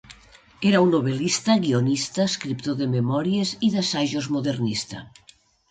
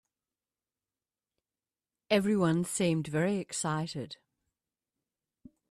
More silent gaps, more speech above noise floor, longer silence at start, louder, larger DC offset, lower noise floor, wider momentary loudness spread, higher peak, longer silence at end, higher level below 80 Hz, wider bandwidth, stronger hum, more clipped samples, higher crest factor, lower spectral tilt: neither; second, 29 dB vs over 60 dB; second, 0.1 s vs 2.1 s; first, -23 LUFS vs -30 LUFS; neither; second, -52 dBFS vs under -90 dBFS; second, 8 LU vs 13 LU; first, -6 dBFS vs -12 dBFS; second, 0.65 s vs 1.55 s; first, -60 dBFS vs -70 dBFS; second, 9.4 kHz vs 14.5 kHz; neither; neither; second, 16 dB vs 22 dB; about the same, -5 dB/octave vs -5 dB/octave